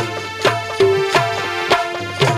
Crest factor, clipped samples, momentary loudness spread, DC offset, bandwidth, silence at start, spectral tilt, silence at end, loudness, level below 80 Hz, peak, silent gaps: 16 dB; under 0.1%; 5 LU; under 0.1%; 15 kHz; 0 s; -4.5 dB/octave; 0 s; -17 LUFS; -52 dBFS; -2 dBFS; none